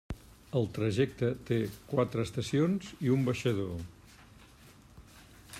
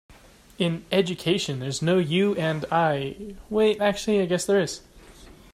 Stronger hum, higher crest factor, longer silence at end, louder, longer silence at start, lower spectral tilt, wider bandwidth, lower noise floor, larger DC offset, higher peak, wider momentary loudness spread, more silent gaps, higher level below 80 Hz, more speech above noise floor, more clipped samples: neither; about the same, 18 dB vs 16 dB; second, 0 s vs 0.25 s; second, -32 LUFS vs -24 LUFS; about the same, 0.1 s vs 0.1 s; first, -7 dB/octave vs -5 dB/octave; about the same, 15 kHz vs 15.5 kHz; first, -56 dBFS vs -48 dBFS; neither; second, -14 dBFS vs -8 dBFS; first, 11 LU vs 8 LU; neither; about the same, -56 dBFS vs -54 dBFS; about the same, 25 dB vs 24 dB; neither